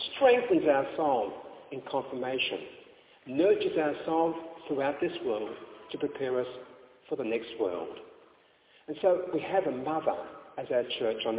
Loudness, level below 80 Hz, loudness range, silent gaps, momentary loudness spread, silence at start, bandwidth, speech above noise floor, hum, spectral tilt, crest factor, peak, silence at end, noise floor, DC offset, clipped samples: -30 LUFS; -70 dBFS; 5 LU; none; 17 LU; 0 s; 4 kHz; 33 dB; none; -3 dB/octave; 20 dB; -10 dBFS; 0 s; -62 dBFS; under 0.1%; under 0.1%